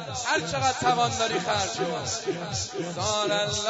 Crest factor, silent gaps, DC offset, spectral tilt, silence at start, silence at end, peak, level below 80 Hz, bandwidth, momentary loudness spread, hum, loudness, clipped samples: 18 dB; none; under 0.1%; -3 dB/octave; 0 s; 0 s; -10 dBFS; -56 dBFS; 8 kHz; 6 LU; none; -26 LUFS; under 0.1%